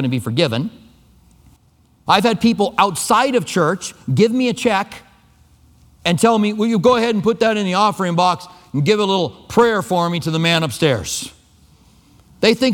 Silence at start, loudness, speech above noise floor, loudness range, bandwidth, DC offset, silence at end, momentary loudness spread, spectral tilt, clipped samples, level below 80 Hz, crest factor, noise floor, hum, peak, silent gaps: 0 s; -17 LUFS; 38 dB; 2 LU; 18.5 kHz; under 0.1%; 0 s; 9 LU; -5 dB/octave; under 0.1%; -52 dBFS; 18 dB; -54 dBFS; none; 0 dBFS; none